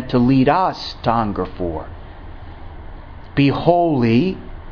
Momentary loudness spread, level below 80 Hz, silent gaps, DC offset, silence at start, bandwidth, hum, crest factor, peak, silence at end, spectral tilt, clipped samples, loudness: 23 LU; -36 dBFS; none; under 0.1%; 0 s; 5.4 kHz; none; 18 dB; 0 dBFS; 0 s; -8.5 dB/octave; under 0.1%; -17 LUFS